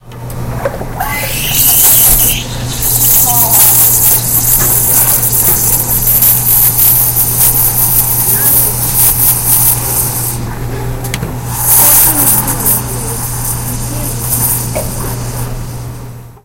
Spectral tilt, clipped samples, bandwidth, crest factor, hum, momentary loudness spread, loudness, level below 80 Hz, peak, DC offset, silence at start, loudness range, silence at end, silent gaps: -2.5 dB/octave; 1%; over 20 kHz; 10 dB; none; 15 LU; -7 LUFS; -26 dBFS; 0 dBFS; under 0.1%; 0.05 s; 6 LU; 0.1 s; none